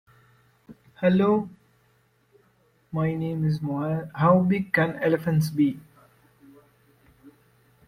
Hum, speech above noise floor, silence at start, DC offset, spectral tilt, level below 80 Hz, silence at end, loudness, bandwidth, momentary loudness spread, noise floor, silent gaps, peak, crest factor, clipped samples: none; 42 dB; 0.7 s; under 0.1%; -8 dB/octave; -60 dBFS; 0.6 s; -24 LUFS; 15.5 kHz; 8 LU; -64 dBFS; none; -6 dBFS; 20 dB; under 0.1%